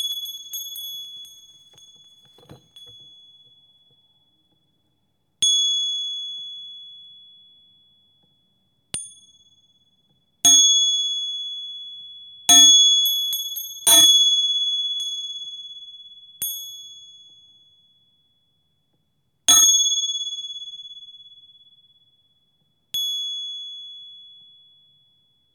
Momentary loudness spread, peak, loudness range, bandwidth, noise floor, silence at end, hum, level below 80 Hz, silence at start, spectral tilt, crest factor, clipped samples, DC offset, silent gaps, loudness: 26 LU; -4 dBFS; 22 LU; 19 kHz; -71 dBFS; 1.4 s; none; -72 dBFS; 0 s; 2.5 dB/octave; 20 dB; under 0.1%; under 0.1%; none; -16 LUFS